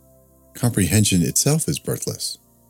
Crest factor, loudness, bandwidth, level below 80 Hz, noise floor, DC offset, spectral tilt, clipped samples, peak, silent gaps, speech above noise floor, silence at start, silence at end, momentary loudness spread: 20 dB; -20 LUFS; 17.5 kHz; -46 dBFS; -53 dBFS; under 0.1%; -4 dB/octave; under 0.1%; -2 dBFS; none; 33 dB; 0.55 s; 0.35 s; 9 LU